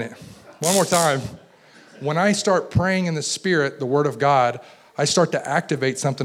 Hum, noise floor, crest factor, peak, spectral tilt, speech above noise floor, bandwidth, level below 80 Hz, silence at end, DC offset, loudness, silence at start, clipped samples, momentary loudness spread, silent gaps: none; -50 dBFS; 16 dB; -6 dBFS; -4 dB/octave; 29 dB; 17 kHz; -52 dBFS; 0 s; under 0.1%; -20 LUFS; 0 s; under 0.1%; 9 LU; none